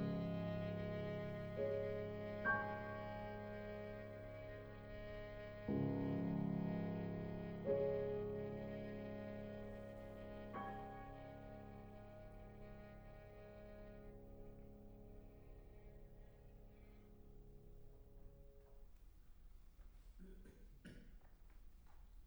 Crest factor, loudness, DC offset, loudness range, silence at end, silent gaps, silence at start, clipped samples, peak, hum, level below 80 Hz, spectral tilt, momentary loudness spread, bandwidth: 20 dB; -47 LUFS; under 0.1%; 21 LU; 0 s; none; 0 s; under 0.1%; -28 dBFS; none; -62 dBFS; -8.5 dB/octave; 24 LU; over 20 kHz